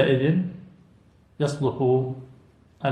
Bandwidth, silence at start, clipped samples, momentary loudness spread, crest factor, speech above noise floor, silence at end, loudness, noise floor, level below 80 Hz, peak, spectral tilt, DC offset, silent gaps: 10 kHz; 0 s; under 0.1%; 14 LU; 20 dB; 34 dB; 0 s; -25 LUFS; -56 dBFS; -60 dBFS; -6 dBFS; -7.5 dB/octave; under 0.1%; none